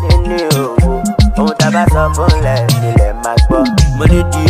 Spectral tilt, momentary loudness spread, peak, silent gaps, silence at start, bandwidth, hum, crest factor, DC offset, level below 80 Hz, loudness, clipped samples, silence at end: -6 dB/octave; 3 LU; 0 dBFS; none; 0 s; 15.5 kHz; none; 10 dB; under 0.1%; -14 dBFS; -12 LUFS; under 0.1%; 0 s